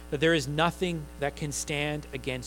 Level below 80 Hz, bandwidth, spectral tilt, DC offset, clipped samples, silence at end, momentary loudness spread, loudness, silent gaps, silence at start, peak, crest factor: -46 dBFS; 18.5 kHz; -4.5 dB/octave; under 0.1%; under 0.1%; 0 s; 9 LU; -29 LUFS; none; 0 s; -8 dBFS; 20 dB